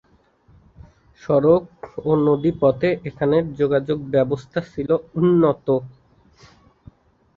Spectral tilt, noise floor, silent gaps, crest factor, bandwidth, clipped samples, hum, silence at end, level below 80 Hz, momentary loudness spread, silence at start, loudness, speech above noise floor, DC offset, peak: -9.5 dB/octave; -57 dBFS; none; 18 dB; 7 kHz; under 0.1%; none; 1.45 s; -52 dBFS; 10 LU; 1.25 s; -20 LUFS; 38 dB; under 0.1%; -4 dBFS